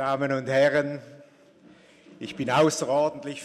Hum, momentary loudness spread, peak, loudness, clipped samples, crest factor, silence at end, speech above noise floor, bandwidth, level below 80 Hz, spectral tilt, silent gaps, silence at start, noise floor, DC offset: none; 17 LU; -10 dBFS; -24 LUFS; under 0.1%; 16 dB; 0 s; 30 dB; 13.5 kHz; -68 dBFS; -4.5 dB/octave; none; 0 s; -54 dBFS; under 0.1%